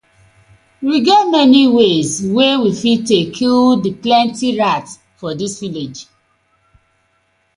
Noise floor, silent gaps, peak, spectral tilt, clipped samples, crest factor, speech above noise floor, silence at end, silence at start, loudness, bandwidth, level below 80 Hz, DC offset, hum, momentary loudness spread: -61 dBFS; none; 0 dBFS; -4.5 dB/octave; under 0.1%; 14 dB; 48 dB; 1.55 s; 0.8 s; -13 LUFS; 11 kHz; -54 dBFS; under 0.1%; none; 16 LU